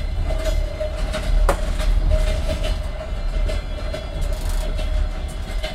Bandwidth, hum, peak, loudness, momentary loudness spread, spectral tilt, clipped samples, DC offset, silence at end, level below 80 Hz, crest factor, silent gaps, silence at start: 13.5 kHz; none; -4 dBFS; -25 LUFS; 7 LU; -5.5 dB/octave; under 0.1%; under 0.1%; 0 s; -22 dBFS; 18 dB; none; 0 s